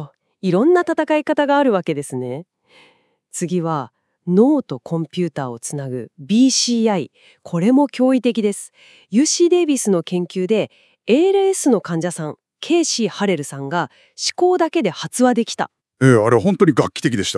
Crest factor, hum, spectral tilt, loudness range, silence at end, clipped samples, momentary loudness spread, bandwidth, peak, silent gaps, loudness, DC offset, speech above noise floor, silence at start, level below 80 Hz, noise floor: 18 dB; none; -5 dB/octave; 4 LU; 0 s; under 0.1%; 14 LU; 12 kHz; 0 dBFS; none; -18 LUFS; under 0.1%; 39 dB; 0 s; -68 dBFS; -57 dBFS